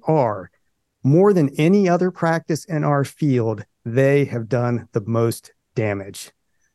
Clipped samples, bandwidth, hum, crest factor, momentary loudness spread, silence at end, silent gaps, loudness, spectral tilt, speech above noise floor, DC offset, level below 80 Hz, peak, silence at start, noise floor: under 0.1%; 12.5 kHz; none; 16 dB; 14 LU; 0.5 s; none; -20 LUFS; -7.5 dB/octave; 31 dB; under 0.1%; -68 dBFS; -4 dBFS; 0.05 s; -50 dBFS